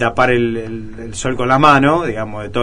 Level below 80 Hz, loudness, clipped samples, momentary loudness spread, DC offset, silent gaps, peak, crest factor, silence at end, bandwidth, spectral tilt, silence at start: -38 dBFS; -14 LUFS; under 0.1%; 17 LU; 2%; none; 0 dBFS; 16 dB; 0 s; 10.5 kHz; -5.5 dB/octave; 0 s